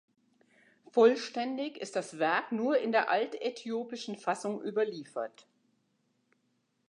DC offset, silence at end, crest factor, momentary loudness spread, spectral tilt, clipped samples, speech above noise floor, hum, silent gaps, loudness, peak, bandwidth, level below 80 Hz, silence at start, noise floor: under 0.1%; 1.6 s; 20 dB; 13 LU; -4.5 dB/octave; under 0.1%; 45 dB; none; none; -31 LUFS; -12 dBFS; 10.5 kHz; under -90 dBFS; 0.95 s; -76 dBFS